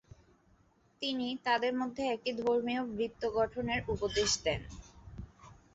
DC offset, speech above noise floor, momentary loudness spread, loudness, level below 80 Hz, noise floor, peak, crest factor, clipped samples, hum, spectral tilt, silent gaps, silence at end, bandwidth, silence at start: under 0.1%; 34 dB; 20 LU; -33 LUFS; -56 dBFS; -68 dBFS; -18 dBFS; 18 dB; under 0.1%; none; -3 dB/octave; none; 0.2 s; 8 kHz; 1 s